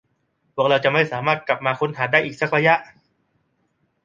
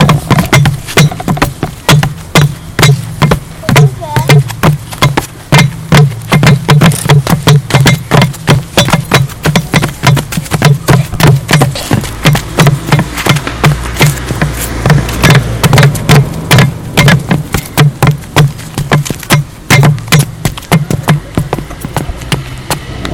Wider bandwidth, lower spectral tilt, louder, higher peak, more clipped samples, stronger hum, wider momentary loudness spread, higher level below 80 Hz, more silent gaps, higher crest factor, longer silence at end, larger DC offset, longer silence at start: second, 7.6 kHz vs 17.5 kHz; about the same, -6 dB/octave vs -5 dB/octave; second, -19 LUFS vs -9 LUFS; about the same, -2 dBFS vs 0 dBFS; second, under 0.1% vs 1%; neither; about the same, 6 LU vs 7 LU; second, -64 dBFS vs -26 dBFS; neither; first, 20 dB vs 8 dB; first, 1.2 s vs 0 s; neither; first, 0.55 s vs 0 s